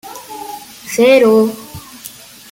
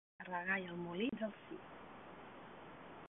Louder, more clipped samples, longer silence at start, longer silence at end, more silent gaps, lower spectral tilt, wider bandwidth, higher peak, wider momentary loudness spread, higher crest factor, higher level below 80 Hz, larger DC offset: first, -11 LUFS vs -43 LUFS; neither; second, 0.05 s vs 0.2 s; first, 0.45 s vs 0 s; neither; first, -4.5 dB/octave vs -1.5 dB/octave; first, 17 kHz vs 3.9 kHz; first, -2 dBFS vs -26 dBFS; first, 23 LU vs 16 LU; second, 14 dB vs 20 dB; first, -54 dBFS vs -76 dBFS; neither